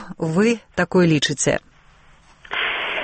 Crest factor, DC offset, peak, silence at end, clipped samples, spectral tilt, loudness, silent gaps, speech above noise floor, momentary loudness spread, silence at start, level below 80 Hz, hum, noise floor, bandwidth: 14 dB; under 0.1%; -6 dBFS; 0 s; under 0.1%; -4.5 dB/octave; -20 LUFS; none; 32 dB; 7 LU; 0 s; -50 dBFS; none; -50 dBFS; 8.8 kHz